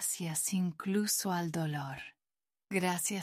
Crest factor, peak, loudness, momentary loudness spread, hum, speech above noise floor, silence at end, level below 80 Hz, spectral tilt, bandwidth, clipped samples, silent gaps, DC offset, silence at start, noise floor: 18 dB; -18 dBFS; -33 LUFS; 10 LU; none; over 56 dB; 0 s; -74 dBFS; -4 dB/octave; 16 kHz; under 0.1%; none; under 0.1%; 0 s; under -90 dBFS